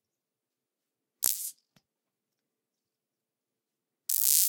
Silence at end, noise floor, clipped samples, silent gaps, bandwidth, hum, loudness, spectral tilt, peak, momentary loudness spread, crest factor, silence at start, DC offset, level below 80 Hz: 0 s; -89 dBFS; under 0.1%; none; 19 kHz; none; -27 LUFS; 3.5 dB/octave; 0 dBFS; 15 LU; 34 dB; 1.2 s; under 0.1%; -88 dBFS